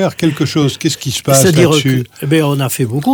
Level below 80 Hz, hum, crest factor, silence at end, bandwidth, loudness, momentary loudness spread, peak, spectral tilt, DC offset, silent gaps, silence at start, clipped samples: -46 dBFS; none; 12 dB; 0 s; over 20 kHz; -13 LUFS; 7 LU; 0 dBFS; -5 dB/octave; under 0.1%; none; 0 s; under 0.1%